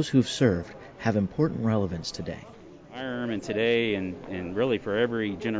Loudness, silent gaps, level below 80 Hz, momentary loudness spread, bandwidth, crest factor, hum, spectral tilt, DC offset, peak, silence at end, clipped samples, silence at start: -28 LUFS; none; -52 dBFS; 13 LU; 8 kHz; 18 dB; none; -6 dB/octave; under 0.1%; -10 dBFS; 0 s; under 0.1%; 0 s